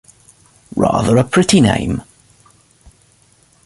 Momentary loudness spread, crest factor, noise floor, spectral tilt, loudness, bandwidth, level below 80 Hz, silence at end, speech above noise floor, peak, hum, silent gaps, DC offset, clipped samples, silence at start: 13 LU; 16 dB; -53 dBFS; -5.5 dB/octave; -14 LUFS; 11.5 kHz; -40 dBFS; 1.65 s; 40 dB; 0 dBFS; none; none; under 0.1%; under 0.1%; 0.75 s